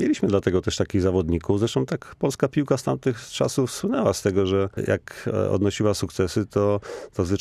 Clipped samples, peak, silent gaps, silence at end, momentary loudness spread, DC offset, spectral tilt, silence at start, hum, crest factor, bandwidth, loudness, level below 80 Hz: under 0.1%; -6 dBFS; none; 0 s; 5 LU; under 0.1%; -6 dB/octave; 0 s; none; 18 dB; 15 kHz; -24 LUFS; -46 dBFS